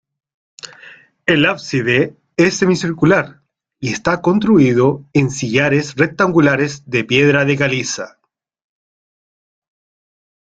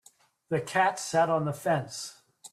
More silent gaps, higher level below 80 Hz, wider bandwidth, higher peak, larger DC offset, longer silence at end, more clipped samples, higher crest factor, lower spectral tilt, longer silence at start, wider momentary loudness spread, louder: neither; first, -52 dBFS vs -72 dBFS; second, 9 kHz vs 15 kHz; first, 0 dBFS vs -12 dBFS; neither; first, 2.4 s vs 0.05 s; neither; about the same, 16 dB vs 18 dB; about the same, -5.5 dB/octave vs -4.5 dB/octave; first, 0.65 s vs 0.5 s; about the same, 13 LU vs 13 LU; first, -15 LUFS vs -28 LUFS